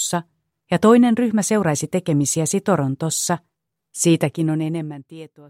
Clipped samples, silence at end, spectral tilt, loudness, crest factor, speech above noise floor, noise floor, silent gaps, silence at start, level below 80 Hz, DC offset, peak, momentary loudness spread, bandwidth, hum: under 0.1%; 0.25 s; -5 dB/octave; -19 LUFS; 16 dB; 29 dB; -48 dBFS; none; 0 s; -62 dBFS; under 0.1%; -4 dBFS; 13 LU; 16.5 kHz; none